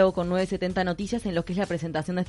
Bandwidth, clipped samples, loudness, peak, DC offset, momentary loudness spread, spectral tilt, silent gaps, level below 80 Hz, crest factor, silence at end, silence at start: 11.5 kHz; under 0.1%; -27 LUFS; -8 dBFS; under 0.1%; 3 LU; -6.5 dB/octave; none; -48 dBFS; 18 dB; 0 s; 0 s